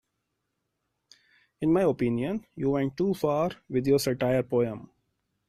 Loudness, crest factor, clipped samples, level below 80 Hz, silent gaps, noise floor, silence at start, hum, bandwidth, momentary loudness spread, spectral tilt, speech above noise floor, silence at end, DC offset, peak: -27 LUFS; 16 dB; under 0.1%; -58 dBFS; none; -80 dBFS; 1.6 s; none; 14 kHz; 7 LU; -6.5 dB/octave; 54 dB; 0.65 s; under 0.1%; -12 dBFS